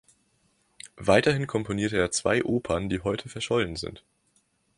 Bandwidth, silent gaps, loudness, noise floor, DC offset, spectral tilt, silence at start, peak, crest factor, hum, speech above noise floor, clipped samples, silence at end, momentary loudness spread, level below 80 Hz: 11.5 kHz; none; -26 LUFS; -69 dBFS; under 0.1%; -4.5 dB/octave; 0.85 s; -6 dBFS; 22 dB; none; 43 dB; under 0.1%; 0.8 s; 13 LU; -50 dBFS